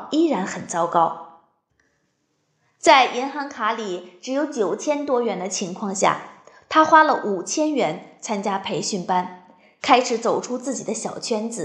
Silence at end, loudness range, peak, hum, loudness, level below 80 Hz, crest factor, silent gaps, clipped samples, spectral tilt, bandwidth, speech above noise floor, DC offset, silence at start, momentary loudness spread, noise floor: 0 s; 3 LU; -2 dBFS; none; -21 LUFS; -72 dBFS; 20 dB; none; under 0.1%; -3.5 dB/octave; 11 kHz; 49 dB; under 0.1%; 0 s; 13 LU; -70 dBFS